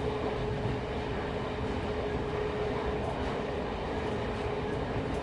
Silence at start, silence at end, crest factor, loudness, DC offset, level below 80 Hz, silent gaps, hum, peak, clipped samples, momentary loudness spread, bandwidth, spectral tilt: 0 s; 0 s; 14 dB; -33 LUFS; under 0.1%; -42 dBFS; none; none; -20 dBFS; under 0.1%; 2 LU; 11 kHz; -7 dB/octave